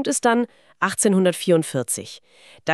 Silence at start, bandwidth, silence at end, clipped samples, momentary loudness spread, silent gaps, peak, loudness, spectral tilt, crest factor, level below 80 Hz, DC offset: 0 s; 13.5 kHz; 0 s; under 0.1%; 12 LU; none; -4 dBFS; -21 LUFS; -4 dB/octave; 18 dB; -70 dBFS; under 0.1%